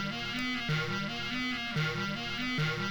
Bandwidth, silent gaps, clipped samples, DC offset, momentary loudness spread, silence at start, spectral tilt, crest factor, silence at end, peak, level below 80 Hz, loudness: over 20 kHz; none; under 0.1%; under 0.1%; 3 LU; 0 s; -4.5 dB/octave; 14 dB; 0 s; -18 dBFS; -56 dBFS; -33 LUFS